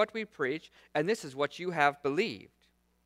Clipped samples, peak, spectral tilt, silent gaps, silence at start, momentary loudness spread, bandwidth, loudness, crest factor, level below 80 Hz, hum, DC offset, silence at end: under 0.1%; -10 dBFS; -5 dB/octave; none; 0 s; 8 LU; 15 kHz; -32 LUFS; 22 dB; -74 dBFS; none; under 0.1%; 0.6 s